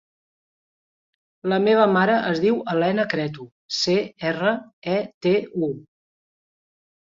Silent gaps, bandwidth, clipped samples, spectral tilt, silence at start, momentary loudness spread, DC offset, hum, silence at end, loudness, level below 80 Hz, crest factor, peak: 3.52-3.69 s, 4.73-4.82 s, 5.14-5.21 s; 7.8 kHz; under 0.1%; -5.5 dB/octave; 1.45 s; 12 LU; under 0.1%; none; 1.4 s; -22 LUFS; -66 dBFS; 20 dB; -4 dBFS